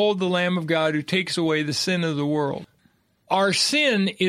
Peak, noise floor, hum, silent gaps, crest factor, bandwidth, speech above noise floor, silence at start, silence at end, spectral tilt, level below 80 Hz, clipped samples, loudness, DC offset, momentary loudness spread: -6 dBFS; -63 dBFS; none; none; 16 dB; 14.5 kHz; 41 dB; 0 s; 0 s; -4 dB/octave; -68 dBFS; under 0.1%; -22 LUFS; under 0.1%; 6 LU